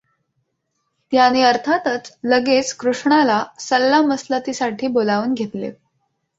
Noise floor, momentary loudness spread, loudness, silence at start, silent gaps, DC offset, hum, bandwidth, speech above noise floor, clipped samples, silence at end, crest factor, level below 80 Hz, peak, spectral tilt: -72 dBFS; 9 LU; -18 LUFS; 1.1 s; none; under 0.1%; none; 8 kHz; 55 dB; under 0.1%; 0.65 s; 18 dB; -64 dBFS; -2 dBFS; -3.5 dB/octave